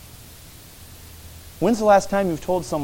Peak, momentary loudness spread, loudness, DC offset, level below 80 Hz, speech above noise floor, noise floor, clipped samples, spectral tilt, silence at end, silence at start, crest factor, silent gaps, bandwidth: -4 dBFS; 25 LU; -20 LUFS; under 0.1%; -46 dBFS; 24 dB; -43 dBFS; under 0.1%; -5.5 dB/octave; 0 s; 0.15 s; 18 dB; none; 17 kHz